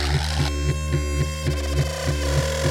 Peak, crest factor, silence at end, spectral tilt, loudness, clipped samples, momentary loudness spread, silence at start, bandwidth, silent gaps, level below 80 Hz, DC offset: -8 dBFS; 14 dB; 0 s; -5 dB/octave; -24 LUFS; under 0.1%; 2 LU; 0 s; 16.5 kHz; none; -26 dBFS; under 0.1%